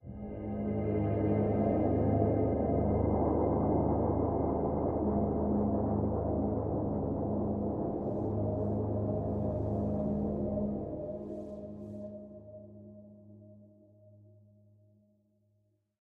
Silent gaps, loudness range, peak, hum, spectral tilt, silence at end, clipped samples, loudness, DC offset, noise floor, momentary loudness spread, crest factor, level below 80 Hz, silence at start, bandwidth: none; 15 LU; -18 dBFS; none; -13 dB/octave; 2.35 s; under 0.1%; -32 LUFS; under 0.1%; -74 dBFS; 14 LU; 16 dB; -46 dBFS; 0.05 s; 3 kHz